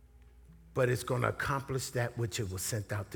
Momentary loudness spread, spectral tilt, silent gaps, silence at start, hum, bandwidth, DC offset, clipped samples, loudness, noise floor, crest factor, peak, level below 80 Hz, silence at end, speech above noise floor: 4 LU; -5 dB/octave; none; 0.15 s; none; over 20 kHz; under 0.1%; under 0.1%; -34 LUFS; -57 dBFS; 22 dB; -12 dBFS; -56 dBFS; 0 s; 24 dB